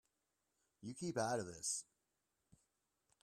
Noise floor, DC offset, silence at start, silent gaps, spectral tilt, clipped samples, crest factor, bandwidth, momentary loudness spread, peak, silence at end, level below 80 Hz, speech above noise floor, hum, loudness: -88 dBFS; under 0.1%; 0.8 s; none; -3.5 dB/octave; under 0.1%; 22 dB; 14 kHz; 12 LU; -26 dBFS; 1.4 s; -80 dBFS; 44 dB; none; -43 LUFS